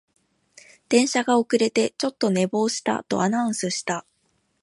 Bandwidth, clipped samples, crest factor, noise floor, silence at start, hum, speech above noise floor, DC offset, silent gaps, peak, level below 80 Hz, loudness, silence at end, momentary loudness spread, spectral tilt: 11.5 kHz; under 0.1%; 20 dB; -69 dBFS; 0.9 s; none; 47 dB; under 0.1%; none; -4 dBFS; -70 dBFS; -23 LUFS; 0.6 s; 6 LU; -4 dB/octave